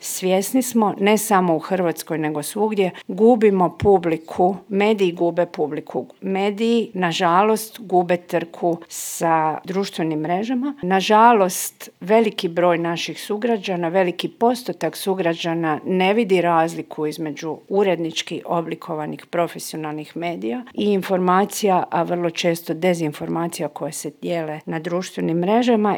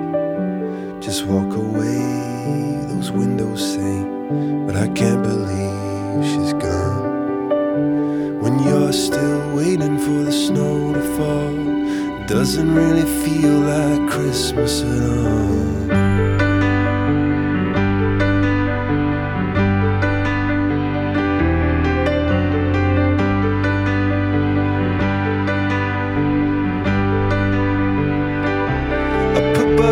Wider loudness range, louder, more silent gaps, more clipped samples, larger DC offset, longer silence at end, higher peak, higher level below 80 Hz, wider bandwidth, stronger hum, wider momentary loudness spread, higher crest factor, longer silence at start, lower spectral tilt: about the same, 5 LU vs 3 LU; about the same, -20 LUFS vs -18 LUFS; neither; neither; neither; about the same, 0 s vs 0 s; about the same, 0 dBFS vs -2 dBFS; second, -60 dBFS vs -32 dBFS; first, over 20 kHz vs 18 kHz; neither; first, 10 LU vs 5 LU; about the same, 20 dB vs 16 dB; about the same, 0 s vs 0 s; second, -5 dB/octave vs -6.5 dB/octave